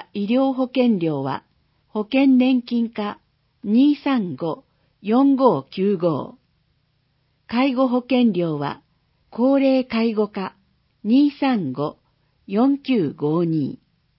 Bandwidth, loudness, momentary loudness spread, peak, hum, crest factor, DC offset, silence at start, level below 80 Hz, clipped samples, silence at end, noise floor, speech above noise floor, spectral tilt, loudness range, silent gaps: 5.8 kHz; -20 LUFS; 13 LU; -2 dBFS; none; 18 dB; under 0.1%; 0 s; -66 dBFS; under 0.1%; 0.45 s; -66 dBFS; 47 dB; -11.5 dB/octave; 2 LU; none